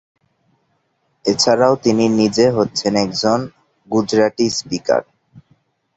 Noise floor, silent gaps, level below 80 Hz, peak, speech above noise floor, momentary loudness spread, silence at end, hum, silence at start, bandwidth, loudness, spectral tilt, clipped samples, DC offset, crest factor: -65 dBFS; none; -56 dBFS; -2 dBFS; 50 dB; 7 LU; 0.55 s; none; 1.25 s; 8.2 kHz; -16 LUFS; -4.5 dB/octave; under 0.1%; under 0.1%; 16 dB